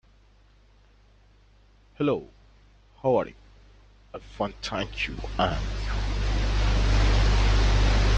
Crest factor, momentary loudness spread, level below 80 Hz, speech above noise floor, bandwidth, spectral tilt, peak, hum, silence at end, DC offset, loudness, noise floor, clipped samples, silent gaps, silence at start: 18 dB; 10 LU; -28 dBFS; 29 dB; 8 kHz; -5.5 dB/octave; -8 dBFS; none; 0 s; under 0.1%; -27 LUFS; -57 dBFS; under 0.1%; none; 2 s